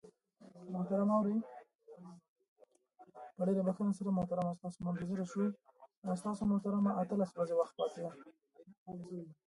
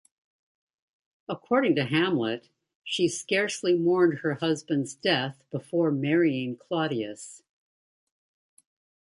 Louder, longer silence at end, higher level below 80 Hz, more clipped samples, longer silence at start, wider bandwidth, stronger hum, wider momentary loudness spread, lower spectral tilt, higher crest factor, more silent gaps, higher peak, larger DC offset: second, -37 LUFS vs -26 LUFS; second, 0.15 s vs 1.75 s; about the same, -72 dBFS vs -74 dBFS; neither; second, 0.05 s vs 1.3 s; about the same, 11.5 kHz vs 11.5 kHz; neither; first, 22 LU vs 14 LU; first, -8.5 dB/octave vs -5 dB/octave; about the same, 16 dB vs 18 dB; first, 1.75-1.79 s, 2.29-2.36 s, 2.48-2.56 s, 5.97-6.02 s, 8.78-8.86 s vs 2.75-2.82 s; second, -22 dBFS vs -10 dBFS; neither